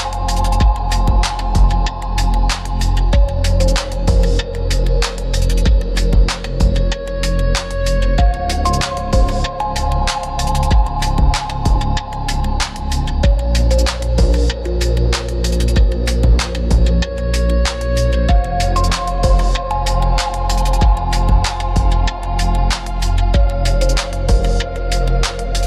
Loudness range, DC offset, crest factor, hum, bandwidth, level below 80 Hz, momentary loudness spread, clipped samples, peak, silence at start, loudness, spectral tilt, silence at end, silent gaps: 1 LU; under 0.1%; 12 dB; none; 12.5 kHz; -16 dBFS; 4 LU; under 0.1%; -2 dBFS; 0 s; -17 LUFS; -5 dB/octave; 0 s; none